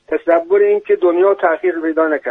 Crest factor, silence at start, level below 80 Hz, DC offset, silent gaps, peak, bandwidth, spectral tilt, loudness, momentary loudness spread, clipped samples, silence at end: 14 dB; 0.1 s; -62 dBFS; under 0.1%; none; 0 dBFS; 3.9 kHz; -7 dB/octave; -14 LUFS; 4 LU; under 0.1%; 0 s